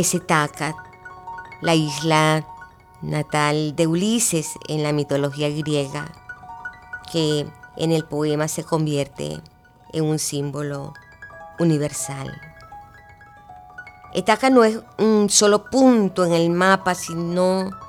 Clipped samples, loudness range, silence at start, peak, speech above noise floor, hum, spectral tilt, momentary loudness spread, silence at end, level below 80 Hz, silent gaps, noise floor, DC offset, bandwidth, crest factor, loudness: under 0.1%; 9 LU; 0 s; -2 dBFS; 26 dB; none; -4.5 dB/octave; 21 LU; 0 s; -56 dBFS; none; -46 dBFS; under 0.1%; 17 kHz; 20 dB; -20 LUFS